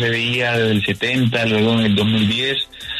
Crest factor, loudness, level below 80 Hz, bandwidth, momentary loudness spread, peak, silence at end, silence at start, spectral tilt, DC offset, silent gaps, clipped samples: 12 dB; -17 LUFS; -50 dBFS; 13.5 kHz; 3 LU; -6 dBFS; 0 s; 0 s; -5.5 dB/octave; under 0.1%; none; under 0.1%